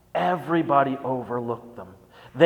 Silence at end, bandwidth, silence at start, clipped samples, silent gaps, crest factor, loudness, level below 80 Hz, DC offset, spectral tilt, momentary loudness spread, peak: 0 s; 19 kHz; 0.15 s; under 0.1%; none; 20 dB; -25 LUFS; -64 dBFS; under 0.1%; -7.5 dB/octave; 21 LU; -4 dBFS